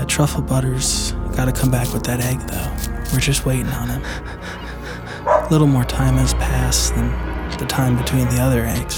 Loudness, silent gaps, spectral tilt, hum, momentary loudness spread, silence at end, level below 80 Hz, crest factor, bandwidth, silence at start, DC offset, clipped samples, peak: -19 LUFS; none; -5 dB/octave; none; 11 LU; 0 s; -26 dBFS; 16 dB; over 20 kHz; 0 s; under 0.1%; under 0.1%; -2 dBFS